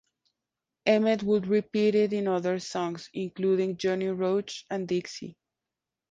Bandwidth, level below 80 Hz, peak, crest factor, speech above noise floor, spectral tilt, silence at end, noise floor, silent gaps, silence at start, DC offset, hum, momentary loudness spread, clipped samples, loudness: 9.2 kHz; -70 dBFS; -8 dBFS; 20 dB; 62 dB; -6 dB/octave; 0.8 s; -88 dBFS; none; 0.85 s; under 0.1%; none; 11 LU; under 0.1%; -28 LUFS